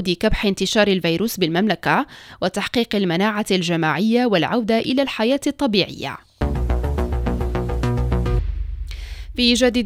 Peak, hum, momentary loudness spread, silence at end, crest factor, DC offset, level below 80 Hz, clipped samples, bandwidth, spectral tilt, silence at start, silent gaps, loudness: -2 dBFS; none; 11 LU; 0 s; 18 dB; under 0.1%; -28 dBFS; under 0.1%; 16 kHz; -5 dB/octave; 0 s; none; -20 LUFS